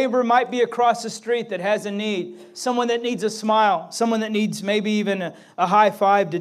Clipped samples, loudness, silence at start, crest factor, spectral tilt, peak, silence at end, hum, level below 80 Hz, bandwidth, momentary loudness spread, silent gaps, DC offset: under 0.1%; -21 LUFS; 0 s; 16 dB; -4.5 dB/octave; -4 dBFS; 0 s; none; -78 dBFS; 15 kHz; 9 LU; none; under 0.1%